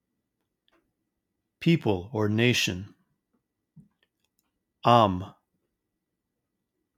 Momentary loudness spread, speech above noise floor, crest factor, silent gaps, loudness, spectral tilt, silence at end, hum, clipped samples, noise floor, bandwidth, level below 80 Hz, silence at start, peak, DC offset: 14 LU; 59 dB; 26 dB; none; -25 LUFS; -5.5 dB/octave; 1.65 s; none; under 0.1%; -83 dBFS; 16.5 kHz; -70 dBFS; 1.6 s; -4 dBFS; under 0.1%